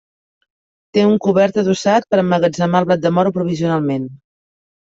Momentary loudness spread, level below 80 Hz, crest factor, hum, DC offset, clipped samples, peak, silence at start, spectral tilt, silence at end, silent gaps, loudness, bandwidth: 6 LU; -58 dBFS; 14 dB; none; under 0.1%; under 0.1%; -2 dBFS; 0.95 s; -6.5 dB/octave; 0.7 s; none; -16 LUFS; 7.8 kHz